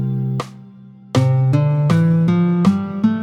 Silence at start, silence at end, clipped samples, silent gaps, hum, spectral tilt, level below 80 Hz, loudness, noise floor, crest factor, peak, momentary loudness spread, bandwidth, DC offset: 0 s; 0 s; under 0.1%; none; none; -8.5 dB/octave; -52 dBFS; -17 LUFS; -40 dBFS; 14 dB; -2 dBFS; 8 LU; 10 kHz; under 0.1%